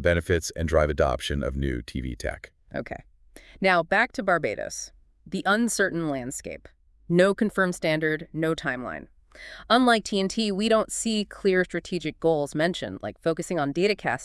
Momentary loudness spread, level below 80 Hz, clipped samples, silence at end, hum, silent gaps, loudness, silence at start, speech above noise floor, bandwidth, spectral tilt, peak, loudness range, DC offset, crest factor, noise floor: 14 LU; -44 dBFS; under 0.1%; 0 s; none; none; -25 LUFS; 0 s; 26 dB; 12 kHz; -4.5 dB/octave; -6 dBFS; 3 LU; under 0.1%; 20 dB; -51 dBFS